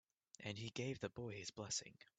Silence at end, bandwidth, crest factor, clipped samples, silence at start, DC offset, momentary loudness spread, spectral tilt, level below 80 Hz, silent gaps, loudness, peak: 0.15 s; 9 kHz; 18 dB; under 0.1%; 0.4 s; under 0.1%; 6 LU; -3.5 dB/octave; -78 dBFS; none; -47 LUFS; -30 dBFS